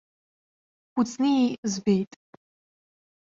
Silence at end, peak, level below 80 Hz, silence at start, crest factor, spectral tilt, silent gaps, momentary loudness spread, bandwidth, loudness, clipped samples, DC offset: 1.2 s; -12 dBFS; -68 dBFS; 0.95 s; 18 dB; -5.5 dB/octave; 1.58-1.63 s; 9 LU; 7.8 kHz; -25 LUFS; under 0.1%; under 0.1%